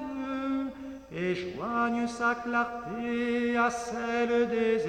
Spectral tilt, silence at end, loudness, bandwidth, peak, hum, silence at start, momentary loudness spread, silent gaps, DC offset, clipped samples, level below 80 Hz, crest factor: -5 dB/octave; 0 s; -30 LUFS; 10 kHz; -14 dBFS; none; 0 s; 8 LU; none; under 0.1%; under 0.1%; -60 dBFS; 16 dB